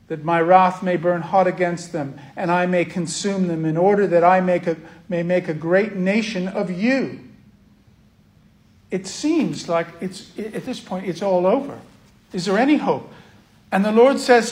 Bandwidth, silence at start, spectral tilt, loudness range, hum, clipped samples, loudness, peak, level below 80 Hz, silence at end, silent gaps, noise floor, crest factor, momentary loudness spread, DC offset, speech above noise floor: 12 kHz; 0.1 s; -6 dB/octave; 7 LU; none; under 0.1%; -20 LUFS; 0 dBFS; -62 dBFS; 0 s; none; -54 dBFS; 20 dB; 15 LU; under 0.1%; 34 dB